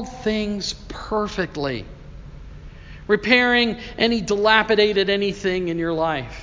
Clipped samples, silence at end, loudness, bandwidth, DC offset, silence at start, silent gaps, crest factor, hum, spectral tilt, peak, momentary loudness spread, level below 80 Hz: under 0.1%; 0 s; -20 LUFS; 7.6 kHz; under 0.1%; 0 s; none; 22 dB; none; -4.5 dB/octave; 0 dBFS; 12 LU; -42 dBFS